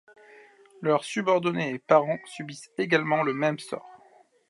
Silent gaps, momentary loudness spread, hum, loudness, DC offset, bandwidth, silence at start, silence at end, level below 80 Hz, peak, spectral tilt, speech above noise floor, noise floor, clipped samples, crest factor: none; 15 LU; none; -26 LUFS; under 0.1%; 11.5 kHz; 0.8 s; 0.55 s; -80 dBFS; -6 dBFS; -5.5 dB/octave; 33 dB; -58 dBFS; under 0.1%; 22 dB